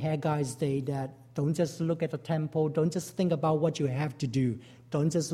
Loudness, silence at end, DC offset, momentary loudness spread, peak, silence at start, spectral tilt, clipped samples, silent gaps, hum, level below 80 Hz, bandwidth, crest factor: -30 LUFS; 0 s; under 0.1%; 6 LU; -14 dBFS; 0 s; -7 dB/octave; under 0.1%; none; none; -64 dBFS; 14 kHz; 16 dB